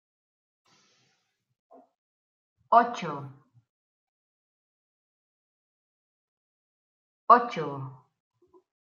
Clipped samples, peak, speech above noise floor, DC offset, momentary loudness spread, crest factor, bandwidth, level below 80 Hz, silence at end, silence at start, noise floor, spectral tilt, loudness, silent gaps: under 0.1%; -4 dBFS; 51 dB; under 0.1%; 22 LU; 28 dB; 7.2 kHz; -88 dBFS; 1 s; 2.7 s; -75 dBFS; -6 dB/octave; -24 LUFS; 3.69-7.27 s